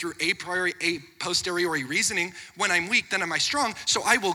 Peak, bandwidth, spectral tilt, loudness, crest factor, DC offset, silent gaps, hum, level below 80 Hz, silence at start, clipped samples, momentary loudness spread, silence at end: -6 dBFS; 19 kHz; -1.5 dB/octave; -25 LUFS; 20 dB; under 0.1%; none; none; -62 dBFS; 0 s; under 0.1%; 6 LU; 0 s